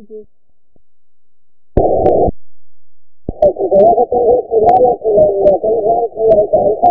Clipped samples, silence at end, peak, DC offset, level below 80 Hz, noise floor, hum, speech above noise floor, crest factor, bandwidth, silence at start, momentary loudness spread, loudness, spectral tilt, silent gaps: 0.1%; 0 s; 0 dBFS; under 0.1%; -34 dBFS; -72 dBFS; none; 62 dB; 12 dB; 3.9 kHz; 0 s; 6 LU; -12 LUFS; -11 dB/octave; none